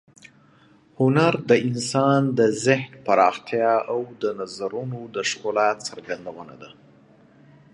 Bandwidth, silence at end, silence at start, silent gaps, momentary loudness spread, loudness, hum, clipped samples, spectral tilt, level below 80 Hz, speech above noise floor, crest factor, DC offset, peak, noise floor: 11 kHz; 1.05 s; 1 s; none; 13 LU; -22 LUFS; none; under 0.1%; -5.5 dB/octave; -68 dBFS; 33 dB; 20 dB; under 0.1%; -2 dBFS; -55 dBFS